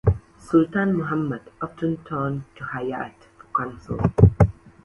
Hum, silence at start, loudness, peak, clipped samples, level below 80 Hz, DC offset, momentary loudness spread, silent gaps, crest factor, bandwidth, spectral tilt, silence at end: none; 0.05 s; -23 LUFS; 0 dBFS; under 0.1%; -34 dBFS; under 0.1%; 15 LU; none; 22 dB; 8.4 kHz; -9.5 dB/octave; 0.3 s